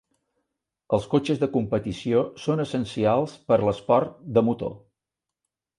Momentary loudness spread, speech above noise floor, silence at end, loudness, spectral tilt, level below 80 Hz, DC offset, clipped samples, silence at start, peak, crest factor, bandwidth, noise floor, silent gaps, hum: 5 LU; 64 dB; 1 s; -24 LUFS; -7.5 dB/octave; -54 dBFS; under 0.1%; under 0.1%; 0.9 s; -6 dBFS; 18 dB; 11 kHz; -87 dBFS; none; none